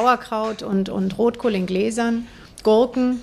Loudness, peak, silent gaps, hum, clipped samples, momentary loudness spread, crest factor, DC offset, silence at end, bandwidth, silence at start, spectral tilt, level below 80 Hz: -21 LUFS; -4 dBFS; none; none; under 0.1%; 8 LU; 16 dB; under 0.1%; 0 s; 13.5 kHz; 0 s; -6 dB/octave; -50 dBFS